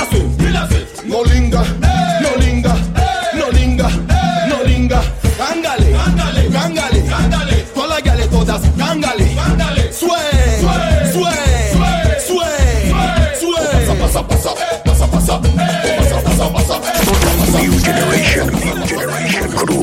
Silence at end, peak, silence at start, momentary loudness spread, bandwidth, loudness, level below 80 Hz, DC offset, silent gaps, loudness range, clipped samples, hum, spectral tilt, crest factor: 0 s; 0 dBFS; 0 s; 4 LU; 16.5 kHz; -14 LUFS; -16 dBFS; under 0.1%; none; 1 LU; under 0.1%; none; -5 dB/octave; 12 dB